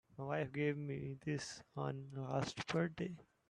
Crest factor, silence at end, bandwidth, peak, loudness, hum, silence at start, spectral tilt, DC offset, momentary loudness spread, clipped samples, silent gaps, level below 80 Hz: 18 dB; 0.25 s; 11 kHz; -24 dBFS; -42 LUFS; none; 0.1 s; -6 dB/octave; under 0.1%; 7 LU; under 0.1%; none; -72 dBFS